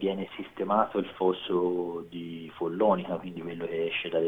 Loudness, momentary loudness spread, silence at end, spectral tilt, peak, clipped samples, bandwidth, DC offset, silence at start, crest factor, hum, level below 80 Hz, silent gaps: -30 LUFS; 12 LU; 0 s; -8 dB/octave; -10 dBFS; under 0.1%; 4 kHz; under 0.1%; 0 s; 20 dB; none; -66 dBFS; none